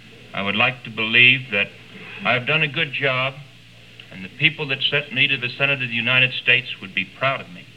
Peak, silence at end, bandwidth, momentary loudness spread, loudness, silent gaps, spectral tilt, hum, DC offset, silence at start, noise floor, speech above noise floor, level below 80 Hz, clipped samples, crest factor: -2 dBFS; 0.15 s; 11.5 kHz; 12 LU; -18 LUFS; none; -5.5 dB/octave; none; 0.2%; 0.05 s; -46 dBFS; 25 dB; -62 dBFS; under 0.1%; 20 dB